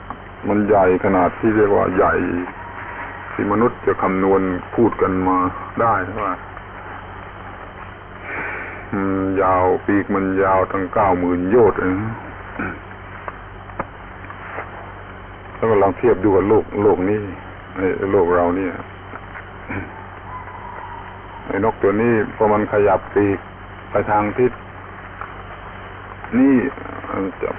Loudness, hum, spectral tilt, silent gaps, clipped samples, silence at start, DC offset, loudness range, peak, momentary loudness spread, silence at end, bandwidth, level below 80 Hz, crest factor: -18 LUFS; none; -11.5 dB/octave; none; under 0.1%; 0 s; under 0.1%; 7 LU; -4 dBFS; 19 LU; 0 s; 3.8 kHz; -40 dBFS; 14 dB